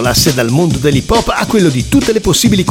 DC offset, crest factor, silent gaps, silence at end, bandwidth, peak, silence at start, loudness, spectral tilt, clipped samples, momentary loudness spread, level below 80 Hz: under 0.1%; 10 dB; none; 0 s; 17 kHz; 0 dBFS; 0 s; -11 LUFS; -4.5 dB/octave; under 0.1%; 3 LU; -26 dBFS